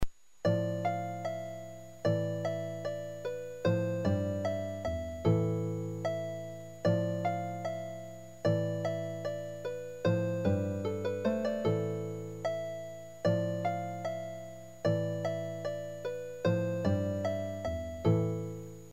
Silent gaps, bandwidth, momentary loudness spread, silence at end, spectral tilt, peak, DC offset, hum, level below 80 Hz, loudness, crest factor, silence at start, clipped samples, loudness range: none; 14.5 kHz; 9 LU; 0 s; -7.5 dB/octave; -16 dBFS; 0.2%; none; -56 dBFS; -34 LUFS; 18 dB; 0 s; under 0.1%; 2 LU